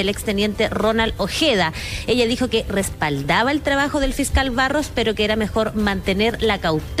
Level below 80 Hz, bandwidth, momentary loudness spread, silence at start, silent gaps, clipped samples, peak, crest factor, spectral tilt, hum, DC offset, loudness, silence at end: -32 dBFS; 15.5 kHz; 4 LU; 0 s; none; under 0.1%; -6 dBFS; 14 dB; -4.5 dB/octave; none; under 0.1%; -20 LUFS; 0 s